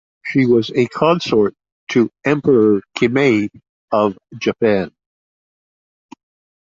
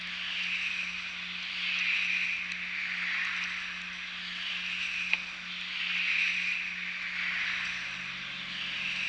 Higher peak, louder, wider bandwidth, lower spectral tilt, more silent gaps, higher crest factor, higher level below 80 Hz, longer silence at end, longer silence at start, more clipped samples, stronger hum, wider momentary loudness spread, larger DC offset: first, -2 dBFS vs -8 dBFS; first, -16 LUFS vs -31 LUFS; second, 7.6 kHz vs 10.5 kHz; first, -6.5 dB/octave vs -0.5 dB/octave; first, 1.72-1.87 s, 3.69-3.88 s vs none; second, 16 dB vs 26 dB; first, -54 dBFS vs -66 dBFS; first, 1.75 s vs 0 s; first, 0.25 s vs 0 s; neither; neither; about the same, 7 LU vs 9 LU; neither